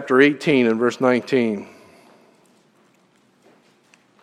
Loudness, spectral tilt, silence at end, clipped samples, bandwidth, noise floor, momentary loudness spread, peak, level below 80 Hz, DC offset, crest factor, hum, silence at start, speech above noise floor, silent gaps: -18 LUFS; -6 dB/octave; 2.6 s; under 0.1%; 11.5 kHz; -59 dBFS; 12 LU; 0 dBFS; -70 dBFS; under 0.1%; 20 dB; none; 0 s; 41 dB; none